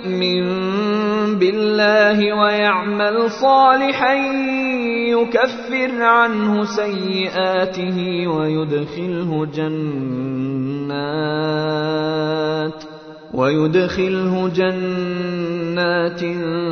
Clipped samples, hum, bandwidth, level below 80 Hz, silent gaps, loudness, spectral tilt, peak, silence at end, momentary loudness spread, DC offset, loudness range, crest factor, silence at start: under 0.1%; none; 6.6 kHz; -56 dBFS; none; -18 LUFS; -6.5 dB/octave; 0 dBFS; 0 s; 9 LU; under 0.1%; 6 LU; 18 dB; 0 s